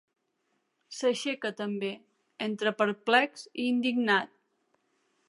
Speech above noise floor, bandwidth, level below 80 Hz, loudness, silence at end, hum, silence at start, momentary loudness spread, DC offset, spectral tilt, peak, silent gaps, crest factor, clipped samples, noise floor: 48 dB; 11.5 kHz; -86 dBFS; -29 LUFS; 1.05 s; none; 0.9 s; 12 LU; under 0.1%; -4 dB/octave; -8 dBFS; none; 24 dB; under 0.1%; -77 dBFS